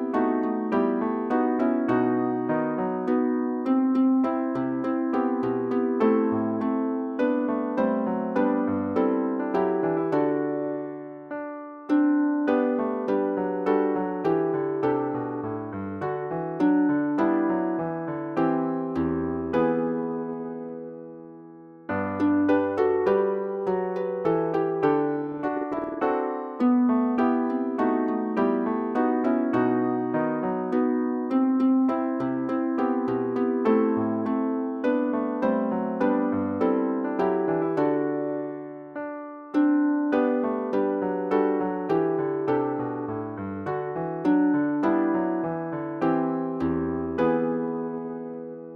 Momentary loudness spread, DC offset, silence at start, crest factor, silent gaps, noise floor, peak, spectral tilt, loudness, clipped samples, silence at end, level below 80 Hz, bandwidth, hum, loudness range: 9 LU; under 0.1%; 0 s; 16 dB; none; -46 dBFS; -10 dBFS; -9.5 dB/octave; -25 LUFS; under 0.1%; 0 s; -60 dBFS; 5.4 kHz; none; 2 LU